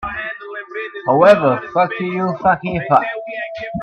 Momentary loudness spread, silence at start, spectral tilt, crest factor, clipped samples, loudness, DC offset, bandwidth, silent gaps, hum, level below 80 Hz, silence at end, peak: 16 LU; 0 s; -7.5 dB/octave; 16 dB; under 0.1%; -17 LUFS; under 0.1%; 8.4 kHz; none; none; -48 dBFS; 0 s; 0 dBFS